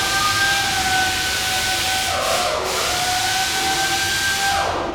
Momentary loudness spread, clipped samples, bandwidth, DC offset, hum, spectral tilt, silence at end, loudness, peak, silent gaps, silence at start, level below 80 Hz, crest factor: 3 LU; under 0.1%; 19.5 kHz; under 0.1%; none; -1 dB/octave; 0 s; -18 LUFS; -6 dBFS; none; 0 s; -42 dBFS; 14 dB